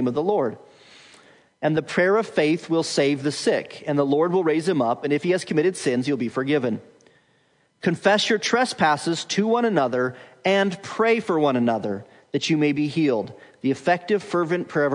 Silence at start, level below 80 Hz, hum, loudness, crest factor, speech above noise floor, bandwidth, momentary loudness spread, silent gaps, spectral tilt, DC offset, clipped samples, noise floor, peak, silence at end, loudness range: 0 s; -72 dBFS; none; -22 LUFS; 18 dB; 42 dB; 11 kHz; 7 LU; none; -5 dB/octave; under 0.1%; under 0.1%; -63 dBFS; -4 dBFS; 0 s; 2 LU